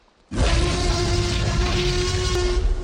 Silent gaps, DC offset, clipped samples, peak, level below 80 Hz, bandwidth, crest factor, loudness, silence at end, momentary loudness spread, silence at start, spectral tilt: none; under 0.1%; under 0.1%; -8 dBFS; -24 dBFS; 15 kHz; 12 dB; -22 LUFS; 0 s; 2 LU; 0.3 s; -4.5 dB/octave